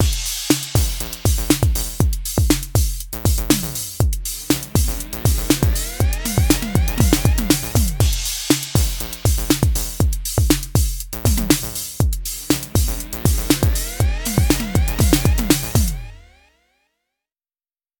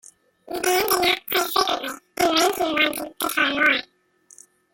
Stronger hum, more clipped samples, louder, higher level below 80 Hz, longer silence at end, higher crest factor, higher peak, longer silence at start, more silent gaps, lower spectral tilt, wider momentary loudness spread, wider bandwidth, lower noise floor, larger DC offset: neither; neither; about the same, -19 LUFS vs -21 LUFS; first, -24 dBFS vs -58 dBFS; first, 1.8 s vs 0.9 s; about the same, 18 dB vs 18 dB; first, 0 dBFS vs -4 dBFS; second, 0 s vs 0.45 s; neither; first, -4.5 dB/octave vs -1 dB/octave; second, 5 LU vs 8 LU; first, over 20 kHz vs 17 kHz; first, under -90 dBFS vs -56 dBFS; neither